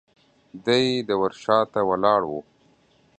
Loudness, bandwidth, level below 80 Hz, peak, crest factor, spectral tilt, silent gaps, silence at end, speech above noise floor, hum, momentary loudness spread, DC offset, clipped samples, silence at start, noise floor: -22 LUFS; 9 kHz; -62 dBFS; -4 dBFS; 20 dB; -5.5 dB/octave; none; 0.8 s; 38 dB; none; 10 LU; under 0.1%; under 0.1%; 0.55 s; -60 dBFS